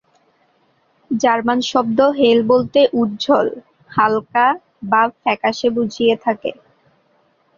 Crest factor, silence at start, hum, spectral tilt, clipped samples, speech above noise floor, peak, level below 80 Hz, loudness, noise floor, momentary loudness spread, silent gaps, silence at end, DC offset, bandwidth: 16 dB; 1.1 s; none; -5 dB/octave; under 0.1%; 44 dB; -2 dBFS; -60 dBFS; -17 LUFS; -60 dBFS; 10 LU; none; 1.05 s; under 0.1%; 7.4 kHz